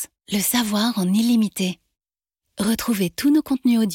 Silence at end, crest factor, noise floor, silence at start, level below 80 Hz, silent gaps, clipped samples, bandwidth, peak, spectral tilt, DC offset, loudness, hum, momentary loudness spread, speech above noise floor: 0 s; 12 dB; -82 dBFS; 0 s; -56 dBFS; none; under 0.1%; 17 kHz; -8 dBFS; -4.5 dB/octave; under 0.1%; -21 LUFS; none; 7 LU; 63 dB